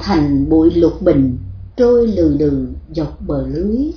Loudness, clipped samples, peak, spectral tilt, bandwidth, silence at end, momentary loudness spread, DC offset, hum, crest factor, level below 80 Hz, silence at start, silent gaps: -15 LUFS; under 0.1%; 0 dBFS; -9 dB/octave; 5.4 kHz; 0 s; 11 LU; under 0.1%; none; 14 dB; -30 dBFS; 0 s; none